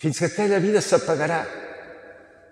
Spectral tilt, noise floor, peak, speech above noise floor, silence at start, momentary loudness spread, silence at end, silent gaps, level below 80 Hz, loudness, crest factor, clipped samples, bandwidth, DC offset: -5 dB/octave; -47 dBFS; -6 dBFS; 25 dB; 0 s; 19 LU; 0.35 s; none; -66 dBFS; -22 LUFS; 18 dB; under 0.1%; 13 kHz; under 0.1%